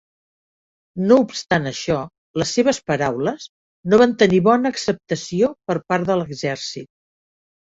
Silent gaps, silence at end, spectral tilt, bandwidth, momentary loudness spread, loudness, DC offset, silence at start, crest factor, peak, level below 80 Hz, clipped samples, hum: 2.18-2.34 s, 3.49-3.83 s; 0.8 s; -5.5 dB/octave; 8 kHz; 13 LU; -19 LUFS; under 0.1%; 0.95 s; 18 dB; -2 dBFS; -56 dBFS; under 0.1%; none